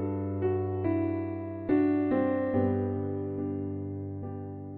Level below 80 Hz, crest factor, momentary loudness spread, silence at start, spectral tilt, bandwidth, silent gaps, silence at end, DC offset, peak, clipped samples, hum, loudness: -64 dBFS; 16 dB; 11 LU; 0 s; -10 dB/octave; 4.2 kHz; none; 0 s; under 0.1%; -14 dBFS; under 0.1%; none; -30 LUFS